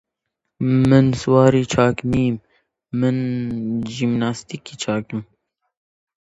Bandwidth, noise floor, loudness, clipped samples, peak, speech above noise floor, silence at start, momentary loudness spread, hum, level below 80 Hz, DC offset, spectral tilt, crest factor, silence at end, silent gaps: 8 kHz; -79 dBFS; -19 LUFS; under 0.1%; 0 dBFS; 61 dB; 0.6 s; 15 LU; none; -48 dBFS; under 0.1%; -7 dB/octave; 20 dB; 1.1 s; none